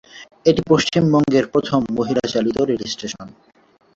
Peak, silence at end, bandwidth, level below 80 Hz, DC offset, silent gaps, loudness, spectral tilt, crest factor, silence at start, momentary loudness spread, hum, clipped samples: -2 dBFS; 0.7 s; 8 kHz; -50 dBFS; under 0.1%; none; -18 LUFS; -6 dB/octave; 18 dB; 0.15 s; 11 LU; none; under 0.1%